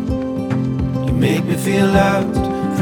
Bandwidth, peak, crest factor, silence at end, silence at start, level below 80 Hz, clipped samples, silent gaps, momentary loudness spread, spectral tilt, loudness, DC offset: 18.5 kHz; 0 dBFS; 16 dB; 0 s; 0 s; -32 dBFS; under 0.1%; none; 7 LU; -6.5 dB/octave; -17 LUFS; under 0.1%